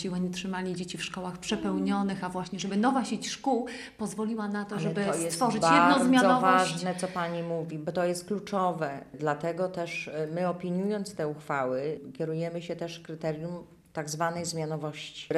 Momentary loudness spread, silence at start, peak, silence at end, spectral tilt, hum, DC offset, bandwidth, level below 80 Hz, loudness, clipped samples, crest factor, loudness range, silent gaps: 14 LU; 0 s; -8 dBFS; 0 s; -5 dB/octave; none; under 0.1%; 15 kHz; -66 dBFS; -29 LUFS; under 0.1%; 22 dB; 9 LU; none